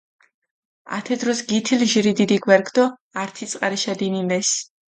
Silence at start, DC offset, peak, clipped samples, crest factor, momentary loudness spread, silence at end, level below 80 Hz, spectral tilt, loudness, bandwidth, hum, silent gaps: 0.85 s; under 0.1%; 0 dBFS; under 0.1%; 20 dB; 12 LU; 0.25 s; -66 dBFS; -3.5 dB/octave; -20 LUFS; 9.6 kHz; none; 3.01-3.11 s